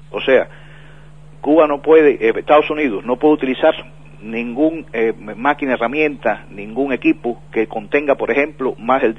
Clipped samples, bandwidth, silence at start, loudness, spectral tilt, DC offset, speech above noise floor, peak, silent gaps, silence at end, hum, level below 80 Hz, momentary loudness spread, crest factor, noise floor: under 0.1%; 6 kHz; 0.1 s; -16 LUFS; -7 dB/octave; 0.9%; 25 dB; 0 dBFS; none; 0 s; none; -48 dBFS; 11 LU; 16 dB; -41 dBFS